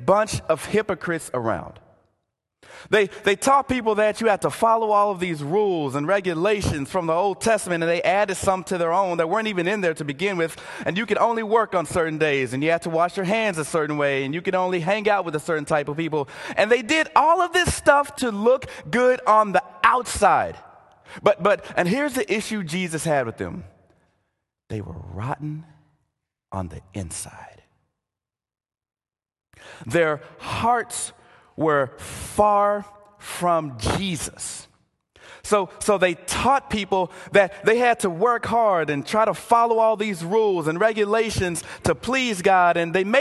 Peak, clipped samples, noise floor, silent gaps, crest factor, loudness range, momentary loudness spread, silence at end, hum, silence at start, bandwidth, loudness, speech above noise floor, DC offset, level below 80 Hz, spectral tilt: 0 dBFS; under 0.1%; -89 dBFS; none; 22 dB; 10 LU; 12 LU; 0 s; none; 0 s; 12.5 kHz; -22 LUFS; 67 dB; under 0.1%; -48 dBFS; -4.5 dB/octave